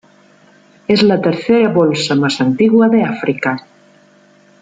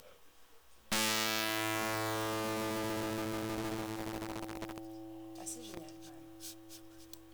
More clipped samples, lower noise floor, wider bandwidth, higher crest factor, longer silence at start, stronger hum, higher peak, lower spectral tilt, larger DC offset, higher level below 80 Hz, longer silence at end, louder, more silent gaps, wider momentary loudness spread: neither; second, -48 dBFS vs -62 dBFS; second, 9.2 kHz vs over 20 kHz; second, 12 dB vs 26 dB; first, 0.9 s vs 0 s; neither; first, -2 dBFS vs -12 dBFS; first, -6 dB/octave vs -3 dB/octave; neither; first, -56 dBFS vs -62 dBFS; first, 1 s vs 0 s; first, -13 LUFS vs -36 LUFS; neither; second, 8 LU vs 20 LU